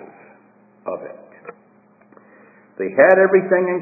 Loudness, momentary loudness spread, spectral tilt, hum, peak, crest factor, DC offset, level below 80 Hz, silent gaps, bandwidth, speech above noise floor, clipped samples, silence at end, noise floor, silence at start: -15 LUFS; 24 LU; -11 dB/octave; none; 0 dBFS; 20 dB; under 0.1%; -72 dBFS; none; 2.7 kHz; 37 dB; under 0.1%; 0 s; -53 dBFS; 0.85 s